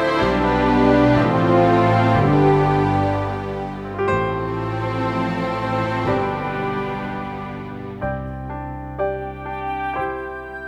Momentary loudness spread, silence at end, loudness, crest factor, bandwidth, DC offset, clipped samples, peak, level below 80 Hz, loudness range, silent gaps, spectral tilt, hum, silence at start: 14 LU; 0 s; -20 LUFS; 16 dB; 10 kHz; under 0.1%; under 0.1%; -4 dBFS; -38 dBFS; 11 LU; none; -8 dB/octave; none; 0 s